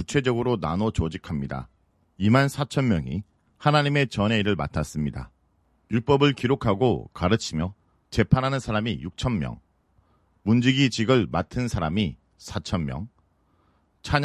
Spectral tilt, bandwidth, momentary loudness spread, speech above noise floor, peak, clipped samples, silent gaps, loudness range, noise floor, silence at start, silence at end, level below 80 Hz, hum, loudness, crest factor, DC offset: -6 dB/octave; 13 kHz; 13 LU; 42 dB; -2 dBFS; under 0.1%; none; 3 LU; -66 dBFS; 0 s; 0 s; -42 dBFS; none; -25 LUFS; 22 dB; under 0.1%